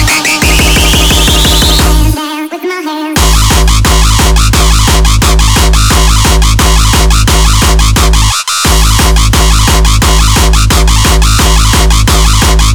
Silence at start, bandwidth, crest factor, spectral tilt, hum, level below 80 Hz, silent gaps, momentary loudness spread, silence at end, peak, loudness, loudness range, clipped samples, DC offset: 0 s; over 20 kHz; 6 dB; -3.5 dB/octave; none; -8 dBFS; none; 3 LU; 0 s; 0 dBFS; -7 LUFS; 1 LU; under 0.1%; 3%